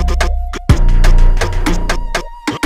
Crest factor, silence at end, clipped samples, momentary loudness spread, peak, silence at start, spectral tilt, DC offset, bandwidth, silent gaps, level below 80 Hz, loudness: 10 dB; 0 s; under 0.1%; 7 LU; 0 dBFS; 0 s; -5 dB/octave; under 0.1%; 11 kHz; none; -12 dBFS; -16 LUFS